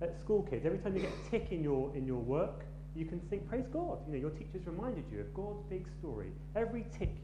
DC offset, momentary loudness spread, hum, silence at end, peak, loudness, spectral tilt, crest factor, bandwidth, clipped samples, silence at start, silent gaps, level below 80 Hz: under 0.1%; 8 LU; none; 0 s; -20 dBFS; -39 LUFS; -8.5 dB/octave; 18 dB; 10.5 kHz; under 0.1%; 0 s; none; -48 dBFS